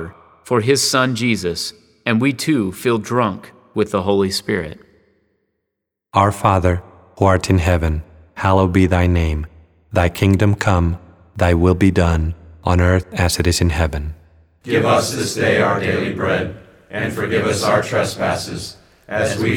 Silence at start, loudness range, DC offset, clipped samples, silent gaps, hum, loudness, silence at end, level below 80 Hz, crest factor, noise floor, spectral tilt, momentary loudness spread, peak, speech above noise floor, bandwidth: 0 s; 4 LU; under 0.1%; under 0.1%; none; none; -17 LUFS; 0 s; -32 dBFS; 16 dB; -79 dBFS; -5.5 dB/octave; 12 LU; 0 dBFS; 62 dB; 17 kHz